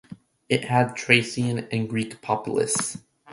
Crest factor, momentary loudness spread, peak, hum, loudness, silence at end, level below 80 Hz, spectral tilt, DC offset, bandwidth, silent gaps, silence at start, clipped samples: 24 dB; 9 LU; 0 dBFS; none; -24 LUFS; 0 s; -60 dBFS; -4 dB/octave; under 0.1%; 11.5 kHz; none; 0.1 s; under 0.1%